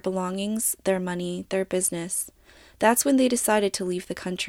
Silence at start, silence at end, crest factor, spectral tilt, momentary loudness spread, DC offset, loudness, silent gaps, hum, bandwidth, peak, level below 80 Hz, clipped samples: 0.05 s; 0 s; 18 dB; -3.5 dB/octave; 9 LU; under 0.1%; -25 LUFS; none; none; 17.5 kHz; -6 dBFS; -58 dBFS; under 0.1%